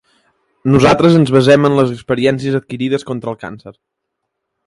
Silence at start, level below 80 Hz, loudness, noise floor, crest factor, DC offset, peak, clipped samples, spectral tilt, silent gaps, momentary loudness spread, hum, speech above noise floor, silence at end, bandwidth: 0.65 s; -44 dBFS; -13 LUFS; -75 dBFS; 14 dB; under 0.1%; 0 dBFS; under 0.1%; -7 dB/octave; none; 14 LU; none; 62 dB; 0.95 s; 11.5 kHz